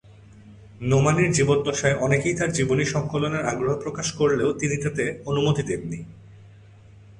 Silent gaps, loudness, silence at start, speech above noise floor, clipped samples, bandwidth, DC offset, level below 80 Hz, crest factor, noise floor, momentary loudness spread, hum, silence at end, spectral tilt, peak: none; -23 LUFS; 0.1 s; 26 dB; under 0.1%; 11 kHz; under 0.1%; -50 dBFS; 18 dB; -48 dBFS; 9 LU; none; 0.05 s; -5 dB/octave; -6 dBFS